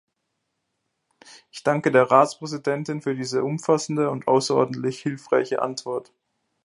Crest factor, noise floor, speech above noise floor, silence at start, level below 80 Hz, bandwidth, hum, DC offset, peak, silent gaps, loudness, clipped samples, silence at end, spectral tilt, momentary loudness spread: 22 dB; -77 dBFS; 55 dB; 1.35 s; -72 dBFS; 11.5 kHz; none; under 0.1%; -2 dBFS; none; -23 LUFS; under 0.1%; 0.6 s; -5.5 dB/octave; 11 LU